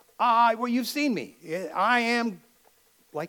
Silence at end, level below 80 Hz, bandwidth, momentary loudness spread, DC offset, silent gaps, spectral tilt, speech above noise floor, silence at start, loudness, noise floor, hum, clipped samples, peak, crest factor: 0 s; -82 dBFS; 19 kHz; 13 LU; under 0.1%; none; -4 dB/octave; 37 dB; 0.2 s; -25 LUFS; -62 dBFS; none; under 0.1%; -10 dBFS; 18 dB